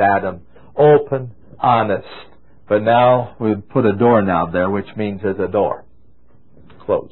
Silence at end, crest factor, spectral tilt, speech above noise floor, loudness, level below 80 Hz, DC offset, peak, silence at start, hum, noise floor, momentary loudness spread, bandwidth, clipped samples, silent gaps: 0.05 s; 14 dB; -12 dB/octave; 38 dB; -17 LUFS; -48 dBFS; 0.9%; -2 dBFS; 0 s; none; -54 dBFS; 13 LU; 4.2 kHz; under 0.1%; none